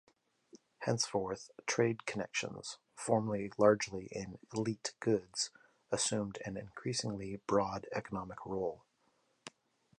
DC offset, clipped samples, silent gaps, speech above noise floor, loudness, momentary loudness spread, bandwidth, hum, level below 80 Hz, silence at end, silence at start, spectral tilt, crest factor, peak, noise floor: under 0.1%; under 0.1%; none; 40 dB; -36 LUFS; 11 LU; 11 kHz; none; -68 dBFS; 0.5 s; 0.55 s; -4 dB/octave; 24 dB; -14 dBFS; -76 dBFS